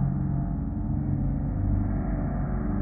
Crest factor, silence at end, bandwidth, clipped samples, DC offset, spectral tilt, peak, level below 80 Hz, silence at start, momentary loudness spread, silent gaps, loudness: 12 dB; 0 s; 2.4 kHz; under 0.1%; under 0.1%; -14.5 dB/octave; -14 dBFS; -32 dBFS; 0 s; 3 LU; none; -29 LUFS